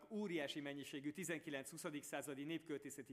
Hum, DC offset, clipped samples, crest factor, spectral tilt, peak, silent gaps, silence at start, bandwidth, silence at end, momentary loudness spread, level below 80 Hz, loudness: none; under 0.1%; under 0.1%; 18 dB; -4 dB/octave; -30 dBFS; none; 0 s; 15.5 kHz; 0 s; 5 LU; -88 dBFS; -48 LUFS